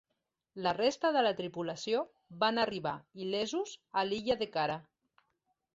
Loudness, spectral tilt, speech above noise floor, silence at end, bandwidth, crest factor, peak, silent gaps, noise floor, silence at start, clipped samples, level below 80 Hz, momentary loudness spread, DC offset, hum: -34 LUFS; -4 dB/octave; 52 dB; 0.9 s; 8 kHz; 18 dB; -16 dBFS; none; -85 dBFS; 0.55 s; under 0.1%; -70 dBFS; 9 LU; under 0.1%; none